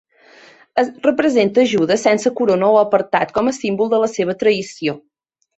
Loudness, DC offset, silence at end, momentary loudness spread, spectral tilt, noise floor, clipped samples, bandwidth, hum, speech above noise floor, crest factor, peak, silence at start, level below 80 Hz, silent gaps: -16 LUFS; under 0.1%; 0.6 s; 8 LU; -5 dB/octave; -46 dBFS; under 0.1%; 8.2 kHz; none; 31 dB; 16 dB; -2 dBFS; 0.75 s; -58 dBFS; none